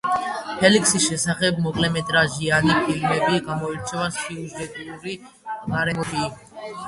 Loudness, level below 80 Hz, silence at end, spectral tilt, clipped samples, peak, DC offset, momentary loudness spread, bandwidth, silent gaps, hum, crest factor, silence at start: -21 LUFS; -50 dBFS; 0 s; -3.5 dB/octave; under 0.1%; -2 dBFS; under 0.1%; 16 LU; 11.5 kHz; none; none; 20 dB; 0.05 s